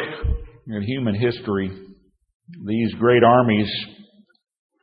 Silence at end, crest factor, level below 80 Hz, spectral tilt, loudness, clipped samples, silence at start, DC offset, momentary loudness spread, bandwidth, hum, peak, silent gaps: 0.8 s; 20 dB; -36 dBFS; -11 dB/octave; -20 LUFS; under 0.1%; 0 s; under 0.1%; 17 LU; 5.2 kHz; none; -2 dBFS; 2.35-2.40 s